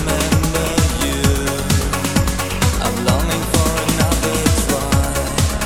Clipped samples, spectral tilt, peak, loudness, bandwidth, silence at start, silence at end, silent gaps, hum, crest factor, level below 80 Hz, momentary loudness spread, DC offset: under 0.1%; -4.5 dB/octave; 0 dBFS; -17 LUFS; 17.5 kHz; 0 s; 0 s; none; none; 16 dB; -24 dBFS; 2 LU; 1%